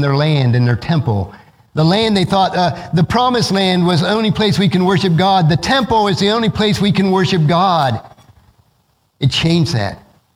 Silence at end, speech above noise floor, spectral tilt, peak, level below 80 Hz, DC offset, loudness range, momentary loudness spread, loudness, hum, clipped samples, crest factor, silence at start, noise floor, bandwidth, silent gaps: 0.4 s; 46 dB; -6 dB/octave; 0 dBFS; -42 dBFS; under 0.1%; 3 LU; 5 LU; -14 LUFS; none; under 0.1%; 14 dB; 0 s; -60 dBFS; 14 kHz; none